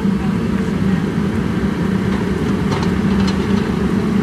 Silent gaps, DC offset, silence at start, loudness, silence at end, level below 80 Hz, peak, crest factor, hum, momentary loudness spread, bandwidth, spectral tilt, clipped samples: none; under 0.1%; 0 s; -17 LUFS; 0 s; -32 dBFS; -4 dBFS; 12 dB; none; 2 LU; 12.5 kHz; -7.5 dB/octave; under 0.1%